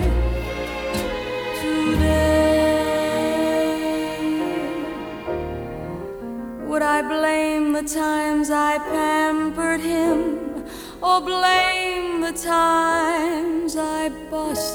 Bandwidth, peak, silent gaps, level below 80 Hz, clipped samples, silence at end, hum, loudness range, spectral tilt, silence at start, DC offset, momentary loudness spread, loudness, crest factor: over 20 kHz; -6 dBFS; none; -34 dBFS; under 0.1%; 0 s; 60 Hz at -55 dBFS; 4 LU; -4.5 dB/octave; 0 s; under 0.1%; 12 LU; -21 LUFS; 16 dB